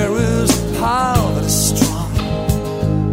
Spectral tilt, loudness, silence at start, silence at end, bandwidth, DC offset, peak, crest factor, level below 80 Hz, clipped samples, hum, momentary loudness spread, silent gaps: -5 dB/octave; -17 LUFS; 0 s; 0 s; 16.5 kHz; under 0.1%; 0 dBFS; 16 dB; -28 dBFS; under 0.1%; none; 5 LU; none